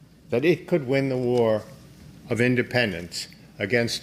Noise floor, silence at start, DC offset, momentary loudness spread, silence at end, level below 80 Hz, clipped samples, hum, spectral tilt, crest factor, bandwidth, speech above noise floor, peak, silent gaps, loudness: -47 dBFS; 0.3 s; under 0.1%; 10 LU; 0 s; -58 dBFS; under 0.1%; none; -5.5 dB/octave; 18 dB; 15.5 kHz; 23 dB; -6 dBFS; none; -24 LUFS